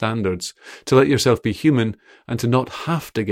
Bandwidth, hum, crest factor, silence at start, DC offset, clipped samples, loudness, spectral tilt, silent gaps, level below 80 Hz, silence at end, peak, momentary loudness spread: 16 kHz; none; 16 dB; 0 s; under 0.1%; under 0.1%; -20 LUFS; -6 dB/octave; none; -50 dBFS; 0 s; -2 dBFS; 14 LU